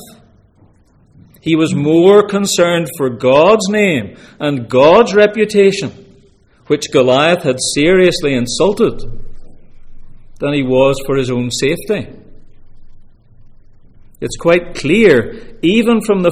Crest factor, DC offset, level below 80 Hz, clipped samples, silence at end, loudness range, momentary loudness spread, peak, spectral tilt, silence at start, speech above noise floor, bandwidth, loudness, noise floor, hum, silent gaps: 14 dB; under 0.1%; -36 dBFS; under 0.1%; 0 s; 6 LU; 12 LU; 0 dBFS; -5 dB/octave; 0 s; 37 dB; 15.5 kHz; -12 LUFS; -49 dBFS; none; none